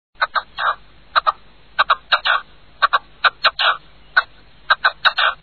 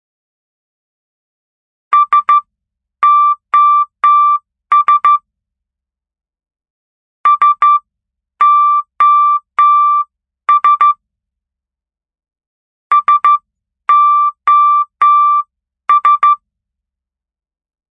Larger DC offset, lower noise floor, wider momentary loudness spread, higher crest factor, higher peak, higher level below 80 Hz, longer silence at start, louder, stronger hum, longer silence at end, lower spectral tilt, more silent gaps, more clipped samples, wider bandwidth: first, 0.5% vs under 0.1%; second, -39 dBFS vs -87 dBFS; about the same, 8 LU vs 7 LU; first, 18 dB vs 12 dB; about the same, -2 dBFS vs 0 dBFS; first, -52 dBFS vs -72 dBFS; second, 0.2 s vs 1.9 s; second, -18 LUFS vs -10 LUFS; neither; second, 0.1 s vs 1.6 s; about the same, -2 dB/octave vs -1 dB/octave; second, none vs 6.70-7.24 s, 12.47-12.90 s; neither; first, 7.4 kHz vs 3.8 kHz